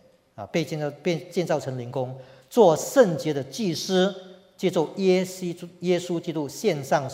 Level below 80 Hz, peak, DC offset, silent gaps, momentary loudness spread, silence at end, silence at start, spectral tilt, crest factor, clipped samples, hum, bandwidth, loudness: -70 dBFS; -4 dBFS; under 0.1%; none; 12 LU; 0 s; 0.4 s; -5.5 dB/octave; 20 dB; under 0.1%; none; 16 kHz; -25 LUFS